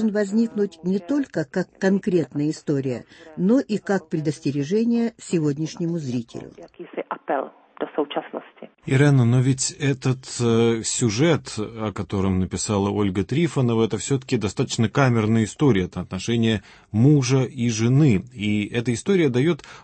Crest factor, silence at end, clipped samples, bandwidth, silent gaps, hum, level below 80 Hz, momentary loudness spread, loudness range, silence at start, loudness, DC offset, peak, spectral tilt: 16 dB; 0.05 s; under 0.1%; 8.8 kHz; none; none; -54 dBFS; 11 LU; 5 LU; 0 s; -22 LUFS; under 0.1%; -6 dBFS; -6 dB/octave